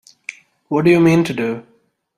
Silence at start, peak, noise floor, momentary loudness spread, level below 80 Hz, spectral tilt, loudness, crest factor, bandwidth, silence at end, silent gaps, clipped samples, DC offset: 0.3 s; -2 dBFS; -37 dBFS; 21 LU; -56 dBFS; -7 dB/octave; -15 LUFS; 16 dB; 13 kHz; 0.55 s; none; under 0.1%; under 0.1%